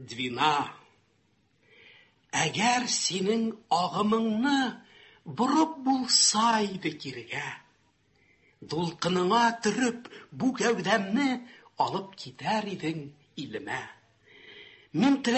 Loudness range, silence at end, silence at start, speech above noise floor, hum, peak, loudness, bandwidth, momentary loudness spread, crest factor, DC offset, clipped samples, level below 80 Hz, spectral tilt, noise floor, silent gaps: 6 LU; 0 s; 0 s; 41 dB; none; -8 dBFS; -27 LUFS; 8.6 kHz; 16 LU; 20 dB; under 0.1%; under 0.1%; -70 dBFS; -3 dB/octave; -69 dBFS; none